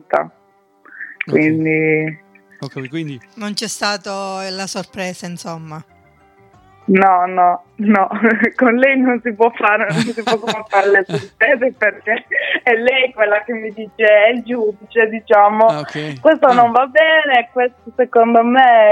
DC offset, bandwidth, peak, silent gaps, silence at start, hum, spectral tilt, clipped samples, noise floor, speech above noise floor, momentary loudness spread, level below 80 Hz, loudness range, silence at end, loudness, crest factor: under 0.1%; 12.5 kHz; 0 dBFS; none; 0.1 s; none; -5 dB/octave; under 0.1%; -55 dBFS; 40 dB; 15 LU; -64 dBFS; 11 LU; 0 s; -14 LUFS; 14 dB